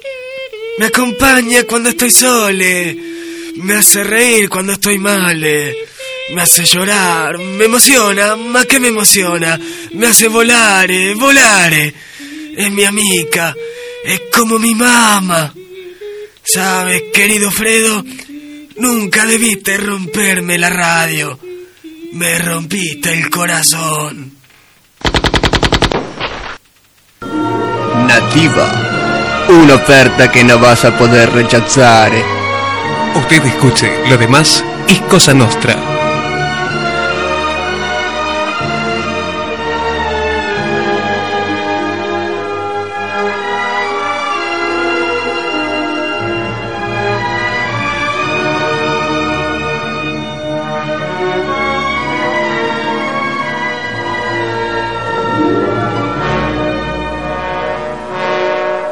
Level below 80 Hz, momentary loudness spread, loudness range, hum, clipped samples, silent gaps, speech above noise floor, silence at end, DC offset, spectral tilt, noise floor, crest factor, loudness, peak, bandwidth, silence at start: -36 dBFS; 13 LU; 8 LU; none; 0.8%; none; 39 dB; 0 s; under 0.1%; -3 dB/octave; -49 dBFS; 12 dB; -11 LUFS; 0 dBFS; over 20 kHz; 0.05 s